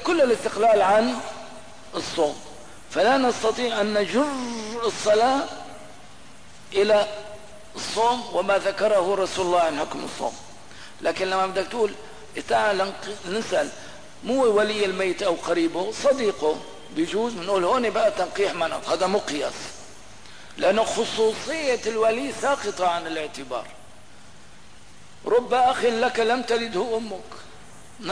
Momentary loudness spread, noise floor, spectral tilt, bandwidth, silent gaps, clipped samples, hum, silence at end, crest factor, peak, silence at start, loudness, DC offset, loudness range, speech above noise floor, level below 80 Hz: 19 LU; -49 dBFS; -3.5 dB/octave; 11 kHz; none; under 0.1%; none; 0 s; 14 dB; -10 dBFS; 0 s; -23 LUFS; 0.8%; 3 LU; 27 dB; -58 dBFS